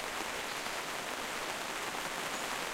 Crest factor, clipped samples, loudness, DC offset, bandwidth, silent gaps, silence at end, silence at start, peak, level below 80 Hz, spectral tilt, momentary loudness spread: 18 dB; under 0.1%; -37 LUFS; under 0.1%; 16 kHz; none; 0 s; 0 s; -20 dBFS; -64 dBFS; -1 dB/octave; 1 LU